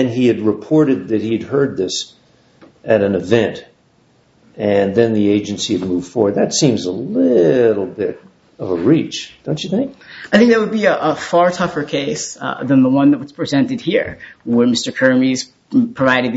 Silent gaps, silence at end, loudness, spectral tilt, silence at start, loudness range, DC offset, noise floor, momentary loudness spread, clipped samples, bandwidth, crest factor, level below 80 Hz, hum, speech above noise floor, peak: none; 0 s; -16 LUFS; -5 dB/octave; 0 s; 3 LU; under 0.1%; -54 dBFS; 11 LU; under 0.1%; 8 kHz; 16 dB; -54 dBFS; none; 39 dB; 0 dBFS